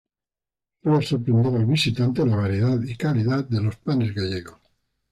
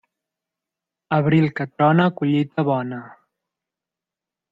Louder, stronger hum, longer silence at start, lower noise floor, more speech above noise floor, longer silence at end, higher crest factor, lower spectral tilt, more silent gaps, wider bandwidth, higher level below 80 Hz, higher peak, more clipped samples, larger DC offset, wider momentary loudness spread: second, -23 LUFS vs -20 LUFS; neither; second, 0.85 s vs 1.1 s; about the same, -89 dBFS vs -88 dBFS; about the same, 68 dB vs 69 dB; second, 0.6 s vs 1.45 s; second, 12 dB vs 18 dB; second, -7 dB/octave vs -9.5 dB/octave; neither; first, 11.5 kHz vs 4.9 kHz; first, -56 dBFS vs -64 dBFS; second, -10 dBFS vs -4 dBFS; neither; neither; about the same, 6 LU vs 8 LU